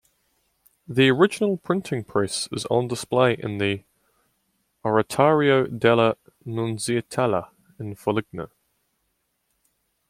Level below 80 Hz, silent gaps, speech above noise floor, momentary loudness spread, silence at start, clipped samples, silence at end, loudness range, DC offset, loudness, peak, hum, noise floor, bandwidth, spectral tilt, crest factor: -62 dBFS; none; 51 dB; 14 LU; 0.9 s; under 0.1%; 1.65 s; 6 LU; under 0.1%; -23 LUFS; -4 dBFS; none; -73 dBFS; 15.5 kHz; -5.5 dB/octave; 20 dB